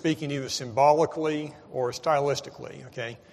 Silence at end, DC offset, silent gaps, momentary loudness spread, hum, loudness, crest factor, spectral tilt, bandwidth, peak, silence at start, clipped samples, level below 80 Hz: 0.15 s; under 0.1%; none; 15 LU; none; -27 LUFS; 20 dB; -5 dB/octave; 13.5 kHz; -8 dBFS; 0 s; under 0.1%; -66 dBFS